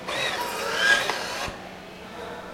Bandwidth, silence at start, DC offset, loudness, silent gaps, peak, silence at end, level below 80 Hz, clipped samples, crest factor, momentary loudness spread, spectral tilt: 16.5 kHz; 0 s; under 0.1%; -24 LUFS; none; -8 dBFS; 0 s; -54 dBFS; under 0.1%; 20 dB; 20 LU; -1.5 dB/octave